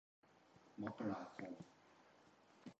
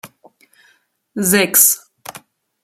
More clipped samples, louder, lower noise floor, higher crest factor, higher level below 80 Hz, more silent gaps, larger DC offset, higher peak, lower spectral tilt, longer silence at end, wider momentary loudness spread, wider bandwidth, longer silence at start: neither; second, -50 LUFS vs -12 LUFS; first, -70 dBFS vs -58 dBFS; about the same, 24 dB vs 20 dB; second, -84 dBFS vs -62 dBFS; neither; neither; second, -30 dBFS vs 0 dBFS; first, -7 dB/octave vs -2 dB/octave; second, 0.05 s vs 0.45 s; second, 22 LU vs 25 LU; second, 8.2 kHz vs 19 kHz; first, 0.25 s vs 0.05 s